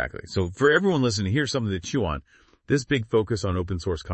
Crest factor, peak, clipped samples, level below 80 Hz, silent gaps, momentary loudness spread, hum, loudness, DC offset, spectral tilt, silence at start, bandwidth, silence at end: 18 dB; -6 dBFS; under 0.1%; -46 dBFS; none; 9 LU; none; -24 LUFS; under 0.1%; -5.5 dB/octave; 0 s; 8.8 kHz; 0 s